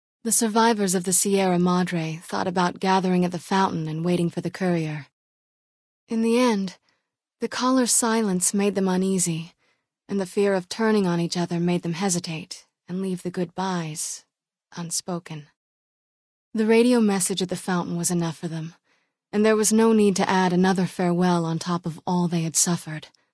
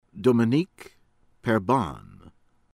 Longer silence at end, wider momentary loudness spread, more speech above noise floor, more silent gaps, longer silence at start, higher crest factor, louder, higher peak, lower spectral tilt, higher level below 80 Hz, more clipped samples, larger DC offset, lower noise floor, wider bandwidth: second, 0.3 s vs 0.75 s; about the same, 14 LU vs 13 LU; first, 53 dB vs 38 dB; first, 5.13-6.07 s, 15.56-16.52 s vs none; about the same, 0.25 s vs 0.15 s; about the same, 20 dB vs 18 dB; about the same, -23 LUFS vs -25 LUFS; first, -4 dBFS vs -8 dBFS; second, -4.5 dB/octave vs -7.5 dB/octave; second, -66 dBFS vs -56 dBFS; neither; neither; first, -75 dBFS vs -61 dBFS; second, 11 kHz vs 12.5 kHz